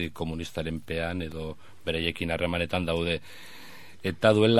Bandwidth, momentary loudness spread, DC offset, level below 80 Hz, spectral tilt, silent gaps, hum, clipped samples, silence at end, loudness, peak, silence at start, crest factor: 15.5 kHz; 19 LU; 0.7%; -48 dBFS; -6 dB/octave; none; none; under 0.1%; 0 s; -29 LUFS; -6 dBFS; 0 s; 22 dB